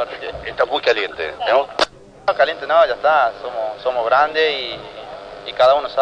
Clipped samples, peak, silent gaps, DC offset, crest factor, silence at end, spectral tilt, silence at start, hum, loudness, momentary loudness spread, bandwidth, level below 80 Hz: under 0.1%; -2 dBFS; none; under 0.1%; 16 dB; 0 s; -3 dB/octave; 0 s; none; -18 LUFS; 14 LU; 10 kHz; -50 dBFS